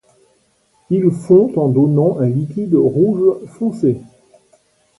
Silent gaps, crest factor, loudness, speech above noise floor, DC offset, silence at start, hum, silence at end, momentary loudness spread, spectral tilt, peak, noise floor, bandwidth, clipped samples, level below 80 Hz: none; 16 dB; -15 LUFS; 45 dB; under 0.1%; 0.9 s; none; 0.95 s; 8 LU; -11 dB/octave; 0 dBFS; -59 dBFS; 11.5 kHz; under 0.1%; -56 dBFS